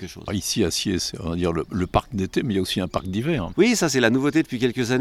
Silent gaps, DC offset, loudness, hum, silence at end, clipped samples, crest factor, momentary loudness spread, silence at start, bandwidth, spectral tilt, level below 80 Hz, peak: none; under 0.1%; -23 LUFS; none; 0 s; under 0.1%; 20 dB; 7 LU; 0 s; 16 kHz; -4.5 dB/octave; -42 dBFS; -4 dBFS